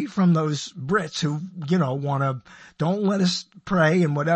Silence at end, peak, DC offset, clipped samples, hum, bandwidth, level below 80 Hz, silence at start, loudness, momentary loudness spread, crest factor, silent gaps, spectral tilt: 0 s; -8 dBFS; under 0.1%; under 0.1%; none; 8.6 kHz; -58 dBFS; 0 s; -23 LUFS; 9 LU; 14 dB; none; -6 dB/octave